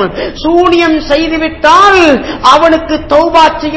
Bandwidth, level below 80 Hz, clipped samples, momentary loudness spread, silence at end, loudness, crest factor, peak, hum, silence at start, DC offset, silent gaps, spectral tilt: 8 kHz; -30 dBFS; 6%; 7 LU; 0 s; -7 LUFS; 8 dB; 0 dBFS; none; 0 s; 0.6%; none; -4 dB/octave